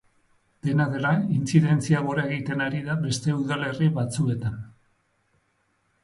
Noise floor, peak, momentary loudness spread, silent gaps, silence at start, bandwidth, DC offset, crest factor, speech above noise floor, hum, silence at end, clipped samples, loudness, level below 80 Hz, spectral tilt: -70 dBFS; -6 dBFS; 8 LU; none; 0.65 s; 11.5 kHz; under 0.1%; 20 dB; 46 dB; none; 1.35 s; under 0.1%; -25 LUFS; -58 dBFS; -6.5 dB/octave